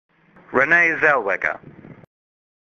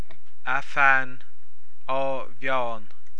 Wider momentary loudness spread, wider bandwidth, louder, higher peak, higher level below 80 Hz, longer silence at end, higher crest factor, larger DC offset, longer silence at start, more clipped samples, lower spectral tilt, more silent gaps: second, 11 LU vs 18 LU; second, 7 kHz vs 11 kHz; first, -17 LUFS vs -24 LUFS; about the same, -2 dBFS vs -4 dBFS; first, -60 dBFS vs -68 dBFS; first, 0.85 s vs 0.4 s; about the same, 20 dB vs 22 dB; second, under 0.1% vs 10%; about the same, 0.5 s vs 0.45 s; neither; about the same, -5.5 dB/octave vs -5 dB/octave; neither